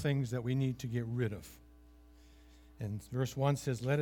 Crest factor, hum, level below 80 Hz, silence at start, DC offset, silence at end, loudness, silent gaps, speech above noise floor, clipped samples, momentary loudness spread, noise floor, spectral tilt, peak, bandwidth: 18 dB; none; -60 dBFS; 0 s; under 0.1%; 0 s; -36 LUFS; none; 24 dB; under 0.1%; 10 LU; -59 dBFS; -7 dB/octave; -18 dBFS; 17 kHz